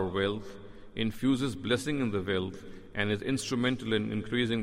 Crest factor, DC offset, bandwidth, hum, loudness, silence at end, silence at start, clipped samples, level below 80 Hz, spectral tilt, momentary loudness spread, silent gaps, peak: 18 dB; under 0.1%; 15.5 kHz; none; -31 LUFS; 0 s; 0 s; under 0.1%; -54 dBFS; -5.5 dB/octave; 11 LU; none; -12 dBFS